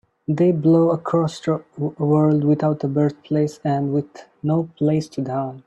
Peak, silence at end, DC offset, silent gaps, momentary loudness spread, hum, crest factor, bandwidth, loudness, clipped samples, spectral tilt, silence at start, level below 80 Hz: -6 dBFS; 0.05 s; under 0.1%; none; 9 LU; none; 14 dB; 8.6 kHz; -20 LUFS; under 0.1%; -9 dB/octave; 0.3 s; -62 dBFS